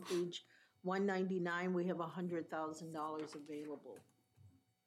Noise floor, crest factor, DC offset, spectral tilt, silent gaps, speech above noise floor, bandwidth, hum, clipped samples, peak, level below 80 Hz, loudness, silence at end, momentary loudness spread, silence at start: -68 dBFS; 16 dB; under 0.1%; -6 dB/octave; none; 26 dB; 14.5 kHz; none; under 0.1%; -26 dBFS; under -90 dBFS; -42 LUFS; 0.35 s; 12 LU; 0 s